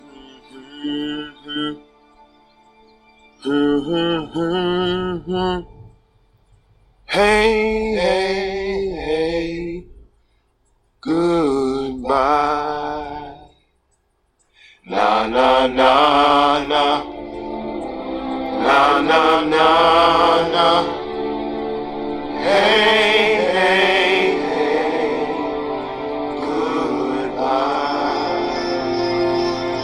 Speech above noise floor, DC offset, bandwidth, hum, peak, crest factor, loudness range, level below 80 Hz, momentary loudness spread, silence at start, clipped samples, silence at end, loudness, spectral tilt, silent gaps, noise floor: 46 dB; under 0.1%; 14 kHz; none; 0 dBFS; 18 dB; 8 LU; -44 dBFS; 14 LU; 0.15 s; under 0.1%; 0 s; -18 LUFS; -4.5 dB/octave; none; -64 dBFS